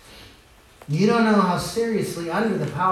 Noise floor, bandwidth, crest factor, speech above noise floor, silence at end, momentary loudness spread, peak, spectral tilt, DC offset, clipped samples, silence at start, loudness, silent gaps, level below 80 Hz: -51 dBFS; 14 kHz; 16 dB; 30 dB; 0 s; 8 LU; -6 dBFS; -6 dB/octave; under 0.1%; under 0.1%; 0.1 s; -22 LUFS; none; -52 dBFS